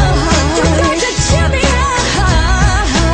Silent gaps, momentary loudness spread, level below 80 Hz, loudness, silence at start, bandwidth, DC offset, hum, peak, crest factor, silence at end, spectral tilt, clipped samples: none; 1 LU; -16 dBFS; -12 LUFS; 0 s; 10 kHz; under 0.1%; none; 0 dBFS; 12 dB; 0 s; -4.5 dB/octave; under 0.1%